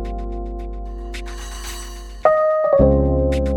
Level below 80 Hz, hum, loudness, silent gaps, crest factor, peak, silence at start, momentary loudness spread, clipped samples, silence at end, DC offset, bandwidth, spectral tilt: -26 dBFS; 50 Hz at -35 dBFS; -18 LUFS; none; 18 dB; 0 dBFS; 0 s; 17 LU; under 0.1%; 0 s; under 0.1%; 16.5 kHz; -7 dB/octave